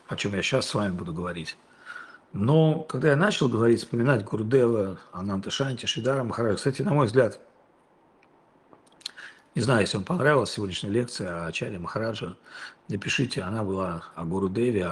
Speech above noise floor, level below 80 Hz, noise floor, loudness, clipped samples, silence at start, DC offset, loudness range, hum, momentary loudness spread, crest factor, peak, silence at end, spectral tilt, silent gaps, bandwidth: 35 dB; -62 dBFS; -61 dBFS; -26 LUFS; under 0.1%; 0.1 s; under 0.1%; 6 LU; none; 17 LU; 20 dB; -6 dBFS; 0 s; -5.5 dB/octave; none; 12 kHz